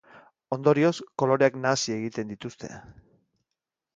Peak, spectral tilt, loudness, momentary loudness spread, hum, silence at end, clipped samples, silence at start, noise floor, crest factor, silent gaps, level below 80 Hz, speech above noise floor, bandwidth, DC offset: -6 dBFS; -5 dB/octave; -25 LUFS; 18 LU; none; 1.05 s; under 0.1%; 0.15 s; -86 dBFS; 22 dB; none; -66 dBFS; 61 dB; 9.4 kHz; under 0.1%